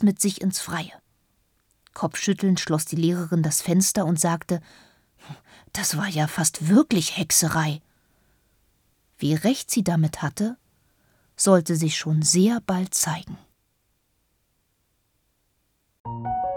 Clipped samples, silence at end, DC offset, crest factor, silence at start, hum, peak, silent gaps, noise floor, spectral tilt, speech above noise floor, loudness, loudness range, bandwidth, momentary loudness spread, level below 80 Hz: under 0.1%; 0 s; under 0.1%; 22 dB; 0 s; none; -4 dBFS; 16.00-16.04 s; -70 dBFS; -4.5 dB/octave; 48 dB; -23 LUFS; 4 LU; 19.5 kHz; 15 LU; -58 dBFS